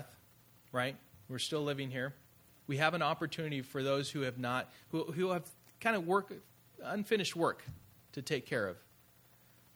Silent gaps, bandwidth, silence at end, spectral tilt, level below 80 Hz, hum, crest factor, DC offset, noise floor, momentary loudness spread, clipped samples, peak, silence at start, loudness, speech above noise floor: none; over 20 kHz; 0.95 s; -5 dB/octave; -74 dBFS; none; 24 dB; under 0.1%; -65 dBFS; 17 LU; under 0.1%; -14 dBFS; 0 s; -36 LUFS; 29 dB